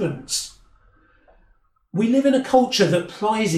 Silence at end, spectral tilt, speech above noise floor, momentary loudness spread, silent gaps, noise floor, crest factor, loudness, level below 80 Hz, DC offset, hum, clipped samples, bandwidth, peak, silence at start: 0 s; -4.5 dB/octave; 40 dB; 8 LU; none; -59 dBFS; 18 dB; -20 LUFS; -56 dBFS; under 0.1%; none; under 0.1%; 15.5 kHz; -4 dBFS; 0 s